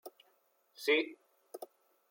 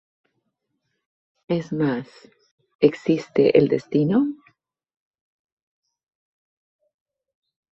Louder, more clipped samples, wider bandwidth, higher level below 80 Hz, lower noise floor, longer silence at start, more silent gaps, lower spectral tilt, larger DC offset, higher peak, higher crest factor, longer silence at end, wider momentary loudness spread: second, -33 LUFS vs -21 LUFS; neither; first, 16.5 kHz vs 7.8 kHz; second, under -90 dBFS vs -64 dBFS; about the same, -73 dBFS vs -76 dBFS; second, 0.05 s vs 1.5 s; second, none vs 2.51-2.58 s, 2.75-2.79 s; second, -1.5 dB/octave vs -8 dB/octave; neither; second, -18 dBFS vs -2 dBFS; about the same, 20 dB vs 22 dB; second, 0.45 s vs 3.4 s; first, 23 LU vs 10 LU